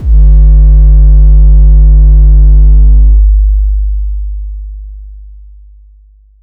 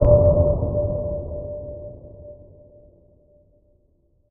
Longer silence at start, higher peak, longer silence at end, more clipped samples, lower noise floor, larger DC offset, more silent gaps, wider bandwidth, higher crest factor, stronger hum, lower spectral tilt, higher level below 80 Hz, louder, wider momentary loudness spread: about the same, 0 s vs 0 s; about the same, 0 dBFS vs -2 dBFS; second, 1.15 s vs 1.95 s; neither; second, -40 dBFS vs -62 dBFS; neither; neither; second, 0.8 kHz vs 2 kHz; second, 4 dB vs 22 dB; neither; second, -13 dB/octave vs -15 dB/octave; first, -4 dBFS vs -30 dBFS; first, -7 LUFS vs -21 LUFS; second, 16 LU vs 26 LU